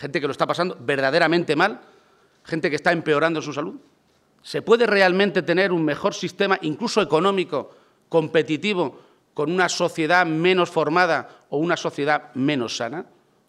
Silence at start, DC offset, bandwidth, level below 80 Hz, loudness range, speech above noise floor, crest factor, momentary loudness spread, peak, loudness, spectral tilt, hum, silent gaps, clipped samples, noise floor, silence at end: 0 s; under 0.1%; 13 kHz; -70 dBFS; 2 LU; 40 dB; 18 dB; 11 LU; -4 dBFS; -21 LUFS; -5 dB/octave; none; none; under 0.1%; -61 dBFS; 0.45 s